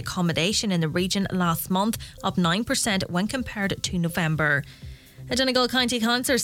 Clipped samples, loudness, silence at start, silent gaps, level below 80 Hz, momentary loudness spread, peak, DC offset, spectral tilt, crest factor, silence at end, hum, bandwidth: under 0.1%; -24 LUFS; 0 s; none; -48 dBFS; 7 LU; -8 dBFS; under 0.1%; -4 dB/octave; 16 dB; 0 s; none; 17.5 kHz